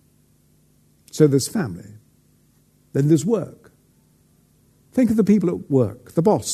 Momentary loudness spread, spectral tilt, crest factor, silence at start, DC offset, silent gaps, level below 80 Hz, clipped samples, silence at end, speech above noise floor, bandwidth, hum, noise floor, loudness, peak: 12 LU; -6.5 dB/octave; 20 dB; 1.15 s; under 0.1%; none; -58 dBFS; under 0.1%; 0 s; 40 dB; 13.5 kHz; none; -58 dBFS; -20 LUFS; -2 dBFS